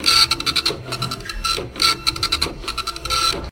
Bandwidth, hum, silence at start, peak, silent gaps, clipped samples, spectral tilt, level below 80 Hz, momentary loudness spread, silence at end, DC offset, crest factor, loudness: 17 kHz; none; 0 s; 0 dBFS; none; under 0.1%; -1.5 dB/octave; -36 dBFS; 11 LU; 0 s; under 0.1%; 20 dB; -19 LUFS